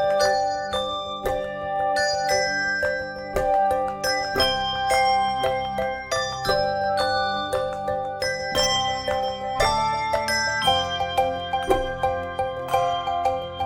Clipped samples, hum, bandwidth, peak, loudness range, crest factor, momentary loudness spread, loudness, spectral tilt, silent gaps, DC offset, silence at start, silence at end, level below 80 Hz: under 0.1%; none; 17.5 kHz; -6 dBFS; 2 LU; 18 dB; 6 LU; -23 LUFS; -2.5 dB/octave; none; under 0.1%; 0 s; 0 s; -44 dBFS